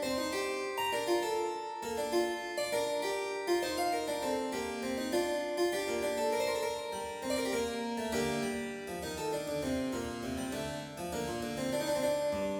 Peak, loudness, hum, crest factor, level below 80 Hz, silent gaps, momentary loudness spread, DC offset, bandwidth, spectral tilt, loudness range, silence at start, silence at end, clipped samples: -20 dBFS; -34 LUFS; none; 14 dB; -60 dBFS; none; 6 LU; under 0.1%; 19 kHz; -3.5 dB/octave; 3 LU; 0 s; 0 s; under 0.1%